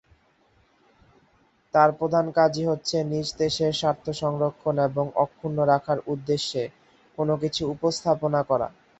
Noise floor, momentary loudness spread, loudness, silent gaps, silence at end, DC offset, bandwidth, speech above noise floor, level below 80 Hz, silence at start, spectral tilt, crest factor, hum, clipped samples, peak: -63 dBFS; 7 LU; -25 LUFS; none; 0.3 s; under 0.1%; 8.2 kHz; 39 dB; -58 dBFS; 1.75 s; -5.5 dB/octave; 20 dB; none; under 0.1%; -4 dBFS